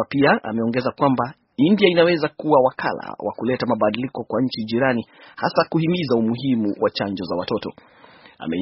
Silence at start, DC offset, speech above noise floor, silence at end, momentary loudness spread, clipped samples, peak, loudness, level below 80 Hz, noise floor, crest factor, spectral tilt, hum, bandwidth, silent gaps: 0 s; under 0.1%; 20 dB; 0 s; 10 LU; under 0.1%; 0 dBFS; -21 LUFS; -58 dBFS; -40 dBFS; 20 dB; -4.5 dB/octave; none; 5.8 kHz; none